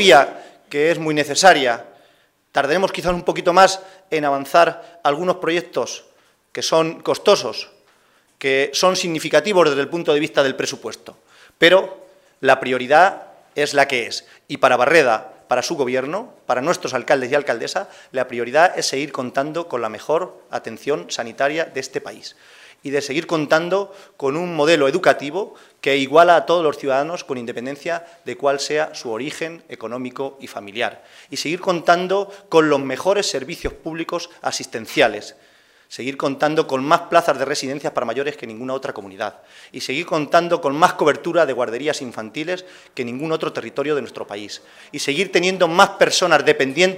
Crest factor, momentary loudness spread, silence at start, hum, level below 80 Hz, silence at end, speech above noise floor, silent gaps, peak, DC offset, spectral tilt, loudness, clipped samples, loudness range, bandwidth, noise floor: 20 dB; 15 LU; 0 s; none; -54 dBFS; 0 s; 39 dB; none; 0 dBFS; under 0.1%; -3.5 dB/octave; -19 LUFS; under 0.1%; 7 LU; 16 kHz; -58 dBFS